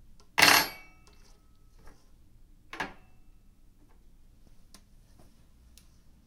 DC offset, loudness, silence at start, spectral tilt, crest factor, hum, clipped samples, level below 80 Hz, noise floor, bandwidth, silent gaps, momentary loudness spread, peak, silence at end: under 0.1%; -24 LUFS; 0.4 s; -0.5 dB/octave; 32 dB; none; under 0.1%; -56 dBFS; -57 dBFS; 16 kHz; none; 27 LU; -2 dBFS; 3.4 s